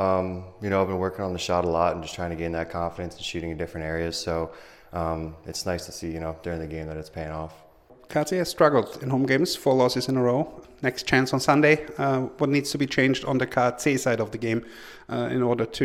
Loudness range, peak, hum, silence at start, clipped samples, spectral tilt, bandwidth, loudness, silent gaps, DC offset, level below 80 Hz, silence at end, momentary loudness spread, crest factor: 9 LU; -4 dBFS; none; 0 s; under 0.1%; -5.5 dB/octave; 16 kHz; -25 LUFS; none; under 0.1%; -52 dBFS; 0 s; 12 LU; 20 dB